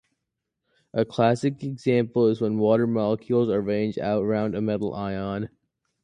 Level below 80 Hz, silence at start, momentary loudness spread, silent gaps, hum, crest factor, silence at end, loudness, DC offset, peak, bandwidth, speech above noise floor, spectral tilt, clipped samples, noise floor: -58 dBFS; 0.95 s; 8 LU; none; none; 18 dB; 0.55 s; -24 LUFS; under 0.1%; -6 dBFS; 9.8 kHz; 59 dB; -8 dB/octave; under 0.1%; -82 dBFS